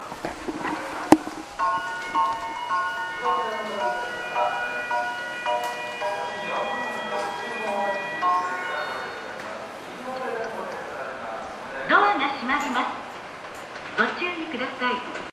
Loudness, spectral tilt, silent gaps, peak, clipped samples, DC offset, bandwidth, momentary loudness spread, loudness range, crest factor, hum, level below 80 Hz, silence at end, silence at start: -27 LUFS; -3.5 dB/octave; none; 0 dBFS; under 0.1%; under 0.1%; 15 kHz; 13 LU; 3 LU; 26 dB; none; -60 dBFS; 0 s; 0 s